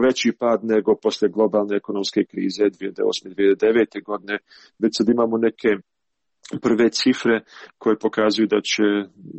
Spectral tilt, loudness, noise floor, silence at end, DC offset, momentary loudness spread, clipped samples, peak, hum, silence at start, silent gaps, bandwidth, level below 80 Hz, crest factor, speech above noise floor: -4.5 dB/octave; -21 LUFS; -81 dBFS; 0 s; under 0.1%; 7 LU; under 0.1%; -6 dBFS; none; 0 s; none; 8.4 kHz; -62 dBFS; 14 dB; 60 dB